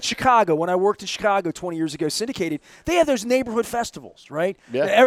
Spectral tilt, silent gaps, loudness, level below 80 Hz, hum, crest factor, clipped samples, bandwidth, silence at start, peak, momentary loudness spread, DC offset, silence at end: -4 dB/octave; none; -22 LUFS; -52 dBFS; none; 18 dB; under 0.1%; 16 kHz; 0 s; -4 dBFS; 10 LU; under 0.1%; 0 s